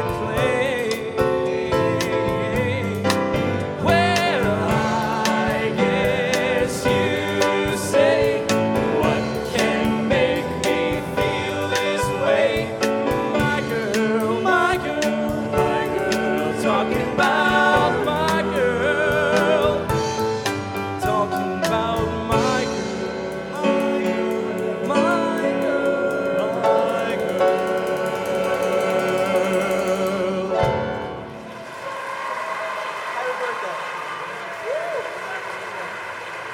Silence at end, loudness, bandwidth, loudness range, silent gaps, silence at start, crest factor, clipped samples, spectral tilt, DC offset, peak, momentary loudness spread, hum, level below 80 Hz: 0 s; -21 LUFS; 18.5 kHz; 6 LU; none; 0 s; 20 dB; under 0.1%; -5 dB/octave; under 0.1%; -2 dBFS; 9 LU; none; -44 dBFS